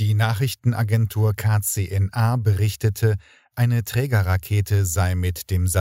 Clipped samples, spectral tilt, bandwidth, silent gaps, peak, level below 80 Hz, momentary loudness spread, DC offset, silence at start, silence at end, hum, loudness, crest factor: under 0.1%; -5.5 dB/octave; 16.5 kHz; none; -6 dBFS; -42 dBFS; 3 LU; under 0.1%; 0 s; 0 s; none; -22 LUFS; 14 dB